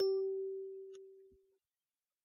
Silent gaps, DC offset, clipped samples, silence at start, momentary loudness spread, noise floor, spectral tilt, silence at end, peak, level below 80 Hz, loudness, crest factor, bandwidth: none; under 0.1%; under 0.1%; 0 s; 20 LU; under -90 dBFS; -4 dB/octave; 0.95 s; -26 dBFS; -88 dBFS; -41 LUFS; 16 dB; 5.6 kHz